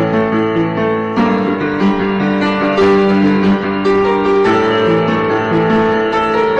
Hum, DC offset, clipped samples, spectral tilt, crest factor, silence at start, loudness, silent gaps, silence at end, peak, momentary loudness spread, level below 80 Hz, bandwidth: none; 0.3%; under 0.1%; -7.5 dB/octave; 8 dB; 0 s; -13 LUFS; none; 0 s; -4 dBFS; 4 LU; -42 dBFS; 8.2 kHz